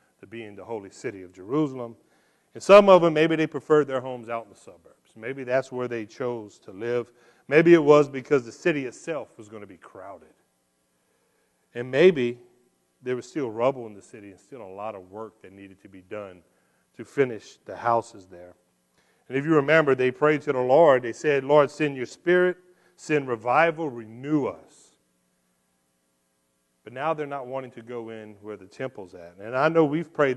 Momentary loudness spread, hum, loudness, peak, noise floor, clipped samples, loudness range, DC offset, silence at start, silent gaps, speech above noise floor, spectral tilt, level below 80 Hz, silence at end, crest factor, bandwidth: 24 LU; none; -23 LUFS; -2 dBFS; -72 dBFS; under 0.1%; 14 LU; under 0.1%; 0.3 s; none; 48 dB; -6.5 dB/octave; -72 dBFS; 0 s; 22 dB; 11.5 kHz